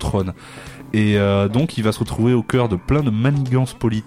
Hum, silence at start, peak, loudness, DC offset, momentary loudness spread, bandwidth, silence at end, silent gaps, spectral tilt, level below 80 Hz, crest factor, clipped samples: none; 0 s; -4 dBFS; -19 LUFS; under 0.1%; 9 LU; 15 kHz; 0 s; none; -7 dB/octave; -38 dBFS; 14 dB; under 0.1%